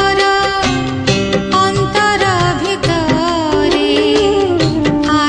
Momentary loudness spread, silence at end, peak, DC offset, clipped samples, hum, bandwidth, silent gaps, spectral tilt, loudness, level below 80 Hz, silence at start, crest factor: 3 LU; 0 s; 0 dBFS; under 0.1%; under 0.1%; none; 10.5 kHz; none; -5 dB/octave; -13 LUFS; -34 dBFS; 0 s; 12 dB